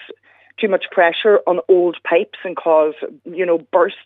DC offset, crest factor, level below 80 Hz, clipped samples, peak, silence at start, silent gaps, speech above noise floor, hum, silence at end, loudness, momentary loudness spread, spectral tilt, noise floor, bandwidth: under 0.1%; 16 dB; -80 dBFS; under 0.1%; 0 dBFS; 0 s; none; 26 dB; none; 0.1 s; -16 LUFS; 9 LU; -7.5 dB/octave; -43 dBFS; 4.1 kHz